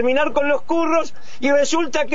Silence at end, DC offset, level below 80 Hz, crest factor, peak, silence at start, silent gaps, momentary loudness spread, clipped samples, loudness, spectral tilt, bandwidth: 0 s; 7%; -54 dBFS; 12 dB; -6 dBFS; 0 s; none; 5 LU; under 0.1%; -19 LUFS; -3 dB/octave; 7.8 kHz